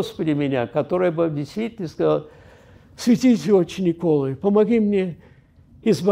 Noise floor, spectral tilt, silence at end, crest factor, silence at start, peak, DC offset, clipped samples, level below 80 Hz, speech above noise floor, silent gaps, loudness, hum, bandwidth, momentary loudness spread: -51 dBFS; -7 dB/octave; 0 s; 16 dB; 0 s; -6 dBFS; under 0.1%; under 0.1%; -56 dBFS; 31 dB; none; -21 LUFS; none; 15.5 kHz; 9 LU